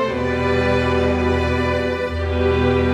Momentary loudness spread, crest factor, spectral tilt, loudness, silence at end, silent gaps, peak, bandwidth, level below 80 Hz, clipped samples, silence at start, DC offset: 4 LU; 12 dB; -7 dB/octave; -19 LUFS; 0 s; none; -6 dBFS; 10 kHz; -30 dBFS; under 0.1%; 0 s; under 0.1%